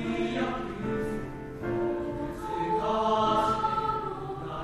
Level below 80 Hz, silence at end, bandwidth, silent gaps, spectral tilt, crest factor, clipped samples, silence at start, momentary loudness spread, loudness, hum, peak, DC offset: -48 dBFS; 0 s; 13 kHz; none; -6.5 dB/octave; 16 dB; under 0.1%; 0 s; 11 LU; -30 LUFS; none; -14 dBFS; under 0.1%